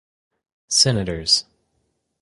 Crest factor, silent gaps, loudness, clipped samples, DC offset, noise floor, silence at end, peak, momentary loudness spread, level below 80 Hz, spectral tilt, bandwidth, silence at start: 22 dB; none; -18 LUFS; under 0.1%; under 0.1%; -71 dBFS; 0.8 s; -2 dBFS; 5 LU; -46 dBFS; -2.5 dB/octave; 11.5 kHz; 0.7 s